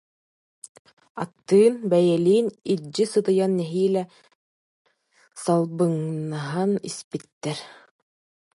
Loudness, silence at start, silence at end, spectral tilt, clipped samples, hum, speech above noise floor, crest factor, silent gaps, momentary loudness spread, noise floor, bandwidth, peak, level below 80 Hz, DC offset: -23 LUFS; 1.15 s; 0.8 s; -6.5 dB/octave; under 0.1%; none; 40 dB; 18 dB; 4.35-4.85 s, 7.04-7.11 s, 7.32-7.41 s; 16 LU; -63 dBFS; 11.5 kHz; -8 dBFS; -72 dBFS; under 0.1%